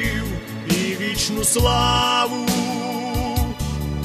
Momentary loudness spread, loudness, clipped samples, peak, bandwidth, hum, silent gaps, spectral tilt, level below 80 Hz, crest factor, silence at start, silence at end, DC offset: 9 LU; -20 LUFS; under 0.1%; -6 dBFS; 14 kHz; none; none; -3.5 dB/octave; -30 dBFS; 16 dB; 0 s; 0 s; under 0.1%